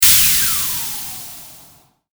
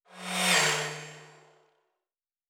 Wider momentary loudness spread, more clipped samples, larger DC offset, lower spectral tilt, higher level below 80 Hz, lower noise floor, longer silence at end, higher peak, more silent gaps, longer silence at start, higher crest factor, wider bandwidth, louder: first, 22 LU vs 19 LU; neither; neither; second, 1 dB/octave vs -1.5 dB/octave; first, -42 dBFS vs -84 dBFS; second, -49 dBFS vs under -90 dBFS; second, 0.55 s vs 1.25 s; first, 0 dBFS vs -12 dBFS; neither; second, 0 s vs 0.15 s; about the same, 18 dB vs 20 dB; about the same, over 20 kHz vs over 20 kHz; first, -13 LUFS vs -26 LUFS